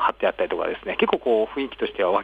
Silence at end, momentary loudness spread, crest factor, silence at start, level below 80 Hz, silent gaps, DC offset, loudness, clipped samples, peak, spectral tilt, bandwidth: 0 s; 6 LU; 16 dB; 0 s; -54 dBFS; none; under 0.1%; -24 LUFS; under 0.1%; -6 dBFS; -6.5 dB/octave; 4.9 kHz